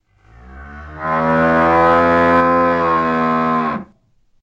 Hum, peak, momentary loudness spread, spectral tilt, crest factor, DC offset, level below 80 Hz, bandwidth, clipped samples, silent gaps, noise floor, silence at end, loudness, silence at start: none; -2 dBFS; 14 LU; -7.5 dB/octave; 14 dB; under 0.1%; -42 dBFS; 7.6 kHz; under 0.1%; none; -56 dBFS; 0.6 s; -14 LUFS; 0.45 s